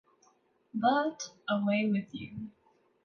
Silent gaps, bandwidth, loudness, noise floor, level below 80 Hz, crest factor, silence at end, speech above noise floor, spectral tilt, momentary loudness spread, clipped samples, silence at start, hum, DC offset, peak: none; 7 kHz; -31 LUFS; -68 dBFS; -72 dBFS; 18 dB; 0.55 s; 37 dB; -5.5 dB/octave; 15 LU; under 0.1%; 0.75 s; none; under 0.1%; -16 dBFS